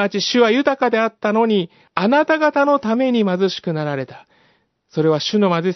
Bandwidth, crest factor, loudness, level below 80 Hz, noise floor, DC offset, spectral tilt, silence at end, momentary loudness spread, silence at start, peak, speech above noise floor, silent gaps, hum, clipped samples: 6.2 kHz; 18 dB; -17 LUFS; -68 dBFS; -60 dBFS; under 0.1%; -5.5 dB/octave; 0 s; 8 LU; 0 s; 0 dBFS; 43 dB; none; none; under 0.1%